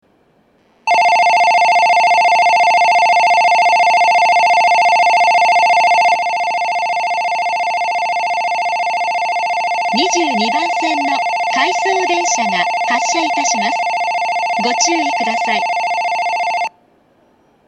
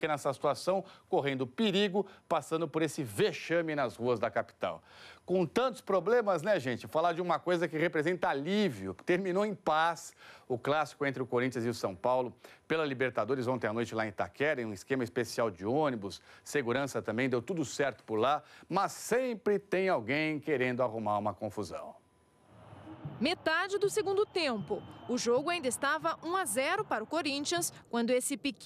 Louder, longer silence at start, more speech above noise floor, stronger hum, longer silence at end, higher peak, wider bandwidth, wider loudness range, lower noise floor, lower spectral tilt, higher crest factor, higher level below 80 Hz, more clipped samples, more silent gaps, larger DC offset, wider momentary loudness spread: first, -13 LUFS vs -32 LUFS; first, 0.85 s vs 0 s; first, 40 dB vs 34 dB; neither; first, 1 s vs 0 s; first, 0 dBFS vs -16 dBFS; second, 10.5 kHz vs 14.5 kHz; first, 6 LU vs 3 LU; second, -55 dBFS vs -66 dBFS; second, -1 dB/octave vs -4.5 dB/octave; about the same, 14 dB vs 16 dB; about the same, -70 dBFS vs -74 dBFS; neither; neither; neither; about the same, 6 LU vs 7 LU